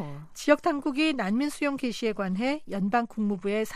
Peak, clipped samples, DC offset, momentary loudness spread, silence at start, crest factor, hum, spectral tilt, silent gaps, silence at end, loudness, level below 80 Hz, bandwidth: -8 dBFS; under 0.1%; under 0.1%; 6 LU; 0 s; 20 dB; none; -5.5 dB/octave; none; 0 s; -27 LUFS; -56 dBFS; 15 kHz